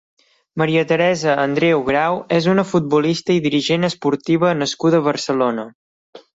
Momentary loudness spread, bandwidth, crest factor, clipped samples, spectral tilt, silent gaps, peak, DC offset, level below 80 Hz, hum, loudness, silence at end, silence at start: 4 LU; 8 kHz; 16 dB; under 0.1%; -5.5 dB/octave; 5.75-6.13 s; -2 dBFS; under 0.1%; -56 dBFS; none; -17 LUFS; 0.2 s; 0.55 s